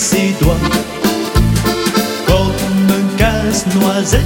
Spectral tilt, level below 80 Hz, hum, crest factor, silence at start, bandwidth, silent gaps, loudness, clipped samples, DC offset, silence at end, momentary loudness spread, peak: -5 dB/octave; -22 dBFS; none; 12 dB; 0 s; 17 kHz; none; -14 LUFS; under 0.1%; under 0.1%; 0 s; 2 LU; 0 dBFS